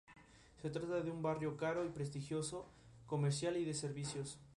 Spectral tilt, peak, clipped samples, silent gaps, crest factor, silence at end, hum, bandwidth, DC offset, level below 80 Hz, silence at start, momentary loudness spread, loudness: -5.5 dB/octave; -26 dBFS; under 0.1%; none; 16 dB; 0.05 s; none; 11.5 kHz; under 0.1%; -70 dBFS; 0.1 s; 8 LU; -42 LUFS